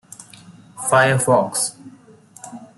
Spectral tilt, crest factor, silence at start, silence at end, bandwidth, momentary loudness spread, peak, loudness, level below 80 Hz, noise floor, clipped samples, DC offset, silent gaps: -4 dB/octave; 18 dB; 0.5 s; 0.15 s; 12.5 kHz; 24 LU; -2 dBFS; -17 LUFS; -60 dBFS; -47 dBFS; under 0.1%; under 0.1%; none